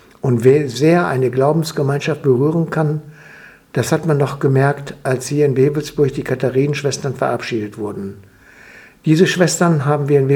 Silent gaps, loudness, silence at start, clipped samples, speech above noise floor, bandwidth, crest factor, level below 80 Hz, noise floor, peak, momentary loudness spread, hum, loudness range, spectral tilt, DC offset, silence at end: none; -17 LUFS; 0.25 s; under 0.1%; 27 dB; 17 kHz; 16 dB; -54 dBFS; -43 dBFS; 0 dBFS; 10 LU; none; 3 LU; -6.5 dB/octave; under 0.1%; 0 s